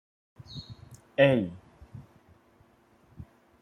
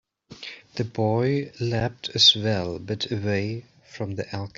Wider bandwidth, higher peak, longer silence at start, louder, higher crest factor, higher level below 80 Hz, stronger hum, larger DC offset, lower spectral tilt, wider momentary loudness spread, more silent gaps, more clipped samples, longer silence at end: first, 9.4 kHz vs 7.8 kHz; second, -8 dBFS vs -4 dBFS; first, 0.5 s vs 0.3 s; second, -26 LUFS vs -23 LUFS; about the same, 24 dB vs 22 dB; about the same, -62 dBFS vs -58 dBFS; neither; neither; first, -7.5 dB/octave vs -4.5 dB/octave; first, 28 LU vs 19 LU; neither; neither; first, 0.4 s vs 0.1 s